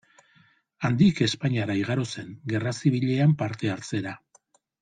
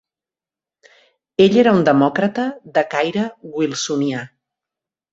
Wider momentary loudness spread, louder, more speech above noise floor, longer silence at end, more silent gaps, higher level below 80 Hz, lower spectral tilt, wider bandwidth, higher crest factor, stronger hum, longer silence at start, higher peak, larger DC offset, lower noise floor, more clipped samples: about the same, 11 LU vs 12 LU; second, -25 LUFS vs -17 LUFS; second, 39 dB vs 73 dB; second, 0.65 s vs 0.85 s; neither; about the same, -62 dBFS vs -60 dBFS; about the same, -6.5 dB/octave vs -5.5 dB/octave; first, 9.4 kHz vs 8 kHz; about the same, 18 dB vs 18 dB; neither; second, 0.8 s vs 1.4 s; second, -8 dBFS vs -2 dBFS; neither; second, -63 dBFS vs -90 dBFS; neither